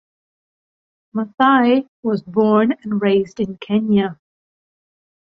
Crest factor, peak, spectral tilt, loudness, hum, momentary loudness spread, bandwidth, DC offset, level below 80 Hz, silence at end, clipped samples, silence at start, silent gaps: 18 dB; -2 dBFS; -8 dB/octave; -18 LUFS; none; 12 LU; 6.4 kHz; under 0.1%; -60 dBFS; 1.25 s; under 0.1%; 1.15 s; 1.88-2.03 s